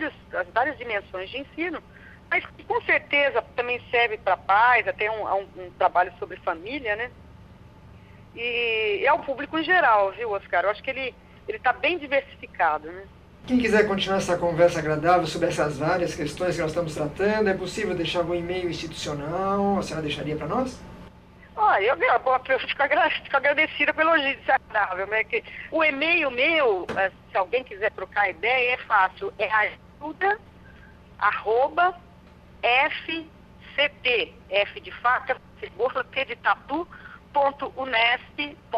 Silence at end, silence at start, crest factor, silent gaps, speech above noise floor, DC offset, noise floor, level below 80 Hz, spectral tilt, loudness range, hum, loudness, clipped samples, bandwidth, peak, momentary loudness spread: 0 s; 0 s; 20 dB; none; 25 dB; under 0.1%; -49 dBFS; -52 dBFS; -4.5 dB/octave; 5 LU; 60 Hz at -55 dBFS; -24 LUFS; under 0.1%; 14 kHz; -4 dBFS; 11 LU